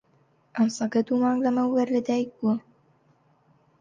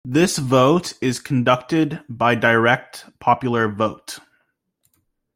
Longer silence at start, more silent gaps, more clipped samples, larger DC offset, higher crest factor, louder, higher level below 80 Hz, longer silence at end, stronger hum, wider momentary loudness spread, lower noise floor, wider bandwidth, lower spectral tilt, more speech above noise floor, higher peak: first, 0.55 s vs 0.05 s; neither; neither; neither; about the same, 14 dB vs 18 dB; second, -25 LUFS vs -19 LUFS; second, -72 dBFS vs -56 dBFS; about the same, 1.2 s vs 1.15 s; neither; second, 5 LU vs 9 LU; second, -64 dBFS vs -69 dBFS; second, 9 kHz vs 16.5 kHz; about the same, -6 dB/octave vs -5 dB/octave; second, 40 dB vs 50 dB; second, -12 dBFS vs -2 dBFS